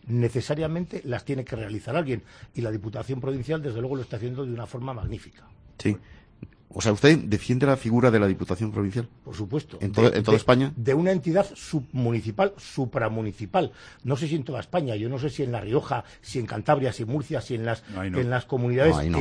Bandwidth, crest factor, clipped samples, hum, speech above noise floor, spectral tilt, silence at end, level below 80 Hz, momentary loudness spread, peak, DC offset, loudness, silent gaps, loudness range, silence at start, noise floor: 10.5 kHz; 22 dB; under 0.1%; none; 22 dB; -7 dB/octave; 0 s; -48 dBFS; 12 LU; -2 dBFS; under 0.1%; -26 LUFS; none; 8 LU; 0.05 s; -47 dBFS